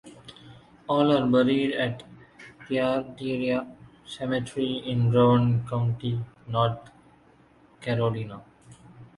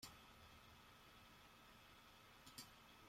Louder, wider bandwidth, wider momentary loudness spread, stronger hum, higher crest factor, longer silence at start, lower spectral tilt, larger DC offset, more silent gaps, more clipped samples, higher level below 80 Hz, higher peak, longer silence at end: first, -25 LUFS vs -63 LUFS; second, 11.5 kHz vs 16 kHz; first, 21 LU vs 6 LU; neither; second, 18 dB vs 24 dB; about the same, 0.05 s vs 0 s; first, -7.5 dB/octave vs -2.5 dB/octave; neither; neither; neither; first, -58 dBFS vs -76 dBFS; first, -8 dBFS vs -40 dBFS; about the same, 0.1 s vs 0 s